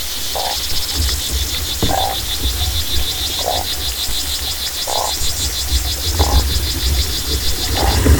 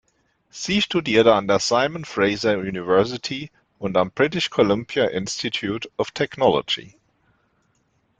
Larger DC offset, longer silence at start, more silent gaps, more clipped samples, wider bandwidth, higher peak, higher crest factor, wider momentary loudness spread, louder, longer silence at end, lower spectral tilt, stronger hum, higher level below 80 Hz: neither; second, 0 s vs 0.55 s; neither; neither; first, 19.5 kHz vs 9.2 kHz; about the same, 0 dBFS vs -2 dBFS; about the same, 18 dB vs 20 dB; second, 3 LU vs 11 LU; first, -17 LUFS vs -21 LUFS; second, 0 s vs 1.3 s; second, -3 dB/octave vs -4.5 dB/octave; neither; first, -22 dBFS vs -56 dBFS